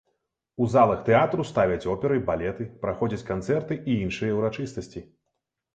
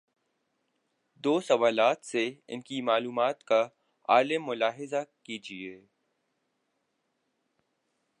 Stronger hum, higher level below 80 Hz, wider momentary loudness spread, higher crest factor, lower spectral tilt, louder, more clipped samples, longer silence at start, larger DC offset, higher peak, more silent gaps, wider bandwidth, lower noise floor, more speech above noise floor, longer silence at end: neither; first, -50 dBFS vs -86 dBFS; second, 13 LU vs 16 LU; about the same, 20 dB vs 22 dB; first, -7.5 dB/octave vs -4 dB/octave; first, -25 LUFS vs -28 LUFS; neither; second, 0.6 s vs 1.25 s; neither; about the same, -6 dBFS vs -8 dBFS; neither; second, 9 kHz vs 11 kHz; about the same, -81 dBFS vs -78 dBFS; first, 56 dB vs 50 dB; second, 0.75 s vs 2.45 s